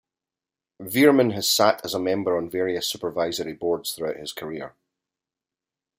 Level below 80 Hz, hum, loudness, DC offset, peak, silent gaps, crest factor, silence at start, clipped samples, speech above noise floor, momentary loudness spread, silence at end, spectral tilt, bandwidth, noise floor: -66 dBFS; none; -23 LUFS; under 0.1%; -2 dBFS; none; 22 dB; 0.8 s; under 0.1%; 67 dB; 15 LU; 1.3 s; -3.5 dB/octave; 16 kHz; -90 dBFS